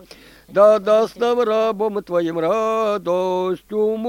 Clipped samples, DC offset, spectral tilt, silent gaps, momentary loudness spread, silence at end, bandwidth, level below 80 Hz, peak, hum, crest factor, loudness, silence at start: under 0.1%; under 0.1%; -6 dB/octave; none; 8 LU; 0 s; 16.5 kHz; -58 dBFS; -2 dBFS; none; 18 dB; -19 LUFS; 0.5 s